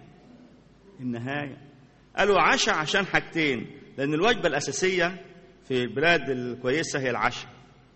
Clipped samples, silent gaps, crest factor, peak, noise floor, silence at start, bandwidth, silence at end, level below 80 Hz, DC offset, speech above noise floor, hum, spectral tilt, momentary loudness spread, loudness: under 0.1%; none; 22 dB; -6 dBFS; -53 dBFS; 0 s; 8.4 kHz; 0.45 s; -54 dBFS; under 0.1%; 28 dB; none; -3.5 dB/octave; 14 LU; -25 LUFS